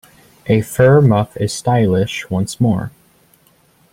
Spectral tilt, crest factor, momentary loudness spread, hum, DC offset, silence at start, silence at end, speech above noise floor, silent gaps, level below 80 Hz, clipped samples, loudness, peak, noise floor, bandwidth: -6.5 dB/octave; 16 dB; 11 LU; none; under 0.1%; 0.45 s; 1.05 s; 40 dB; none; -46 dBFS; under 0.1%; -15 LUFS; 0 dBFS; -54 dBFS; 16 kHz